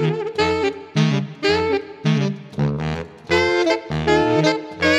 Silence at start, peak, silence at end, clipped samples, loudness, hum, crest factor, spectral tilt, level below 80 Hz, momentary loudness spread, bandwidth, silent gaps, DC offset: 0 s; -4 dBFS; 0 s; under 0.1%; -20 LUFS; none; 16 dB; -6 dB/octave; -44 dBFS; 7 LU; 10.5 kHz; none; under 0.1%